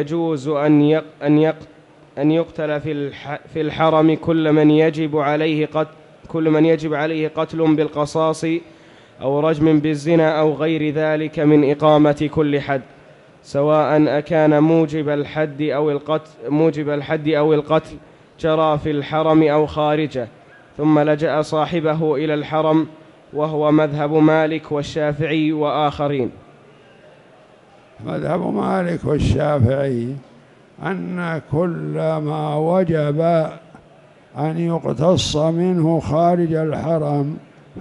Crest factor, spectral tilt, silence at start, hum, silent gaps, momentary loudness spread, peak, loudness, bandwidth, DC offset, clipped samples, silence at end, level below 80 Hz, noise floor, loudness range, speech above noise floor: 16 dB; -7.5 dB/octave; 0 s; none; none; 10 LU; -2 dBFS; -18 LUFS; 11 kHz; under 0.1%; under 0.1%; 0 s; -44 dBFS; -48 dBFS; 4 LU; 31 dB